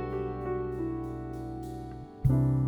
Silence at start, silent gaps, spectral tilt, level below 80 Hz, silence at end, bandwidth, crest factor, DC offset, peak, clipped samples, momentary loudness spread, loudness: 0 s; none; -10 dB/octave; -44 dBFS; 0 s; 4.5 kHz; 18 dB; under 0.1%; -14 dBFS; under 0.1%; 13 LU; -33 LUFS